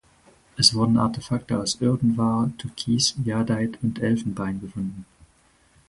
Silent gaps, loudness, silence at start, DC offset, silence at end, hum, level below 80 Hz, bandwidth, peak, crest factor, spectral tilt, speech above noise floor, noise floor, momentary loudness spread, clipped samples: none; -23 LUFS; 0.55 s; under 0.1%; 0.85 s; none; -52 dBFS; 11.5 kHz; -2 dBFS; 22 dB; -4.5 dB/octave; 37 dB; -60 dBFS; 13 LU; under 0.1%